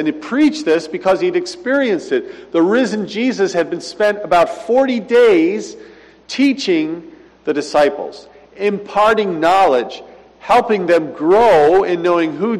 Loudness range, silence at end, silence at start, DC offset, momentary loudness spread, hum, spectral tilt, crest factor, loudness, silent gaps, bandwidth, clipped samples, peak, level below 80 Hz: 4 LU; 0 s; 0 s; under 0.1%; 10 LU; none; -5 dB/octave; 10 dB; -15 LUFS; none; 12.5 kHz; under 0.1%; -4 dBFS; -54 dBFS